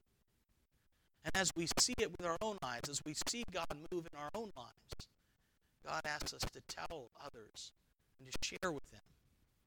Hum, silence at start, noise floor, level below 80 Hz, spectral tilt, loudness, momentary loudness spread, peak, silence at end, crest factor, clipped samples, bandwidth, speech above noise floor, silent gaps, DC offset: none; 1.25 s; -78 dBFS; -60 dBFS; -2 dB/octave; -41 LUFS; 19 LU; -20 dBFS; 0.65 s; 24 dB; under 0.1%; 19 kHz; 36 dB; none; under 0.1%